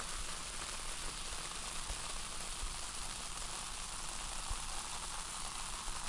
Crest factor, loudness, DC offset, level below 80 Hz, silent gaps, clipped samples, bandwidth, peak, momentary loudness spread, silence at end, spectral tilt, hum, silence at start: 16 dB; -42 LUFS; under 0.1%; -48 dBFS; none; under 0.1%; 11.5 kHz; -26 dBFS; 1 LU; 0 s; -1 dB/octave; none; 0 s